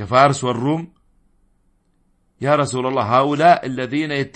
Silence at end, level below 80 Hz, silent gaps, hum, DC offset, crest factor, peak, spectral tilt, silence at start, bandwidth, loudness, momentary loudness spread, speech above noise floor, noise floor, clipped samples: 0.05 s; -56 dBFS; none; none; under 0.1%; 18 dB; 0 dBFS; -5.5 dB/octave; 0 s; 8.8 kHz; -18 LUFS; 10 LU; 44 dB; -61 dBFS; under 0.1%